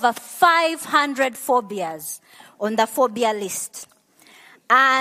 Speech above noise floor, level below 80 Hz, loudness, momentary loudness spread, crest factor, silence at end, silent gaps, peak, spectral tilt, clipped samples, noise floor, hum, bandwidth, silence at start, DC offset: 31 dB; -78 dBFS; -20 LUFS; 16 LU; 18 dB; 0 s; none; -2 dBFS; -2 dB/octave; under 0.1%; -51 dBFS; none; 15 kHz; 0 s; under 0.1%